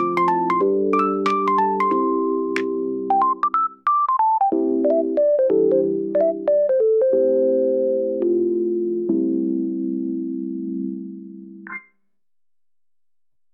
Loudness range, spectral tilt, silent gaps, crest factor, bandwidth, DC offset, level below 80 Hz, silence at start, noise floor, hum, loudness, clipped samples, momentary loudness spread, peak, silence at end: 10 LU; -8 dB/octave; none; 14 dB; 7.8 kHz; under 0.1%; -72 dBFS; 0 s; under -90 dBFS; none; -20 LUFS; under 0.1%; 10 LU; -8 dBFS; 1.75 s